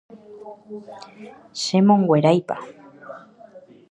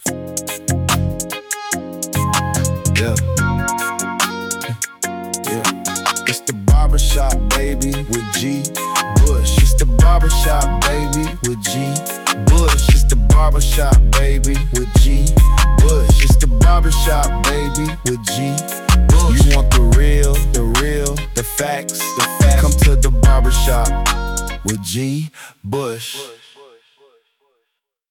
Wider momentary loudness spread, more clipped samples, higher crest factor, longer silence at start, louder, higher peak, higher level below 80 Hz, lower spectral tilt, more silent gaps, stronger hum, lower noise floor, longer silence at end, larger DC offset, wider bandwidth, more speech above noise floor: first, 25 LU vs 9 LU; neither; first, 20 dB vs 12 dB; first, 0.15 s vs 0 s; second, -19 LUFS vs -16 LUFS; about the same, -2 dBFS vs 0 dBFS; second, -70 dBFS vs -16 dBFS; first, -6.5 dB/octave vs -4.5 dB/octave; neither; neither; second, -46 dBFS vs -74 dBFS; second, 0.3 s vs 1.75 s; neither; second, 10 kHz vs 17.5 kHz; second, 26 dB vs 61 dB